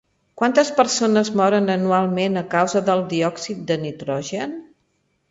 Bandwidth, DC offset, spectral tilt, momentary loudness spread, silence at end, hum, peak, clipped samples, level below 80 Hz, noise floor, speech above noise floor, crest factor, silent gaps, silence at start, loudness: 8 kHz; under 0.1%; -5 dB/octave; 10 LU; 0.65 s; none; -2 dBFS; under 0.1%; -64 dBFS; -68 dBFS; 48 dB; 18 dB; none; 0.35 s; -20 LUFS